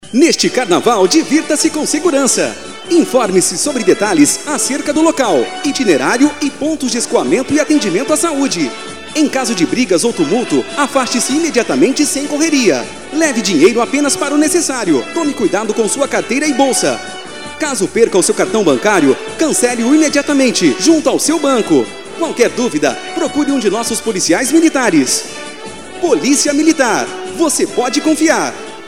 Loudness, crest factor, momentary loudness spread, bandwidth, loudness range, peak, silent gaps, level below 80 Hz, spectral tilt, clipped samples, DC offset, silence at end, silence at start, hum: -13 LUFS; 14 dB; 7 LU; 16 kHz; 2 LU; 0 dBFS; none; -50 dBFS; -3 dB/octave; under 0.1%; 1%; 0 s; 0 s; none